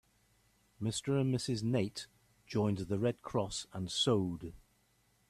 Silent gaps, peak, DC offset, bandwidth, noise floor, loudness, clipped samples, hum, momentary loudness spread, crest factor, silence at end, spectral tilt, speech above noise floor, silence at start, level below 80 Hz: none; -20 dBFS; under 0.1%; 13.5 kHz; -73 dBFS; -35 LUFS; under 0.1%; none; 10 LU; 18 dB; 0.7 s; -5.5 dB/octave; 38 dB; 0.8 s; -64 dBFS